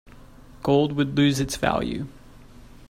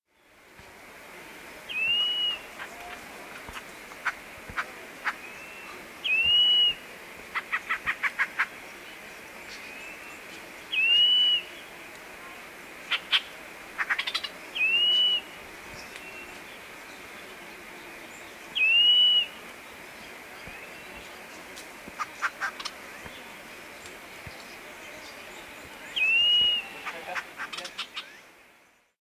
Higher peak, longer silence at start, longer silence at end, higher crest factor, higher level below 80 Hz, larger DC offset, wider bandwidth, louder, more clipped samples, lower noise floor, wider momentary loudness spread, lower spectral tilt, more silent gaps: first, -6 dBFS vs -10 dBFS; second, 0.05 s vs 0.6 s; second, 0.25 s vs 0.85 s; about the same, 18 dB vs 20 dB; first, -46 dBFS vs -64 dBFS; neither; about the same, 15 kHz vs 16 kHz; about the same, -23 LUFS vs -24 LUFS; neither; second, -46 dBFS vs -61 dBFS; second, 11 LU vs 23 LU; first, -5.5 dB/octave vs 0 dB/octave; neither